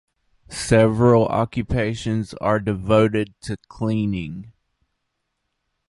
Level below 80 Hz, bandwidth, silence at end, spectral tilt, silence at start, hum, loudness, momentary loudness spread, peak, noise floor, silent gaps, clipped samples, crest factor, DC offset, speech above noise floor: -42 dBFS; 11.5 kHz; 1.4 s; -6.5 dB/octave; 0.5 s; none; -20 LUFS; 16 LU; -2 dBFS; -76 dBFS; none; under 0.1%; 20 dB; under 0.1%; 56 dB